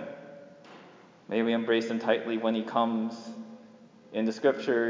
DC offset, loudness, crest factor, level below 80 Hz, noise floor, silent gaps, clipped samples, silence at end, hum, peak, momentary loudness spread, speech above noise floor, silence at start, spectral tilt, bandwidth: under 0.1%; -29 LUFS; 18 dB; -84 dBFS; -54 dBFS; none; under 0.1%; 0 s; none; -12 dBFS; 22 LU; 26 dB; 0 s; -5.5 dB/octave; 7.6 kHz